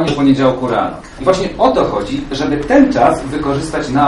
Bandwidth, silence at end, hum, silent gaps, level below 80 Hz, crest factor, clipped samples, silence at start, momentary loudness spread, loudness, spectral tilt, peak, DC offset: 11.5 kHz; 0 s; none; none; -34 dBFS; 14 dB; under 0.1%; 0 s; 8 LU; -14 LUFS; -6 dB/octave; 0 dBFS; under 0.1%